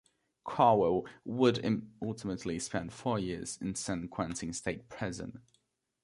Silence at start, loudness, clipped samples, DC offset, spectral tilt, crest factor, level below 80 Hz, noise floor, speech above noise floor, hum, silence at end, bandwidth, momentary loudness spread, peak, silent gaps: 0.45 s; -33 LUFS; under 0.1%; under 0.1%; -5 dB/octave; 22 dB; -60 dBFS; -76 dBFS; 43 dB; none; 0.65 s; 11.5 kHz; 13 LU; -12 dBFS; none